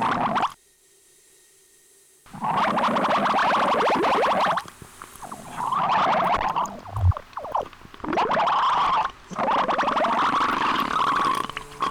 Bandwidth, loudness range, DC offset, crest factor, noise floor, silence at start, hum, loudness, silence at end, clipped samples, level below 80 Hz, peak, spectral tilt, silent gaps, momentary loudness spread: 19 kHz; 3 LU; under 0.1%; 14 dB; -58 dBFS; 0 s; none; -23 LUFS; 0 s; under 0.1%; -44 dBFS; -10 dBFS; -5 dB/octave; none; 11 LU